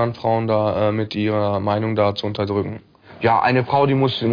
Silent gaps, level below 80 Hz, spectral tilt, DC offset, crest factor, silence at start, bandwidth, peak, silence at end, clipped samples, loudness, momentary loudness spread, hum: none; -54 dBFS; -8.5 dB/octave; under 0.1%; 14 dB; 0 s; 5.2 kHz; -4 dBFS; 0 s; under 0.1%; -20 LUFS; 6 LU; none